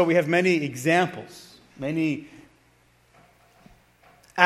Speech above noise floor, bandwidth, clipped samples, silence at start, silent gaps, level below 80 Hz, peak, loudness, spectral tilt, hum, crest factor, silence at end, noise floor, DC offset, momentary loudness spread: 37 dB; 14.5 kHz; under 0.1%; 0 s; none; -66 dBFS; 0 dBFS; -24 LUFS; -5.5 dB/octave; none; 26 dB; 0 s; -61 dBFS; under 0.1%; 19 LU